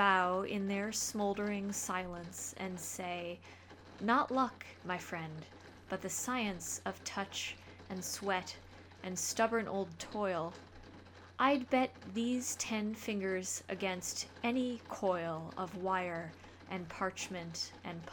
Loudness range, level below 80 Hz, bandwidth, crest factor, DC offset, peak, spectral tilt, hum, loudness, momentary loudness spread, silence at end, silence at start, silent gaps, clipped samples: 4 LU; -68 dBFS; over 20 kHz; 22 dB; under 0.1%; -16 dBFS; -3.5 dB/octave; none; -37 LUFS; 16 LU; 0 s; 0 s; none; under 0.1%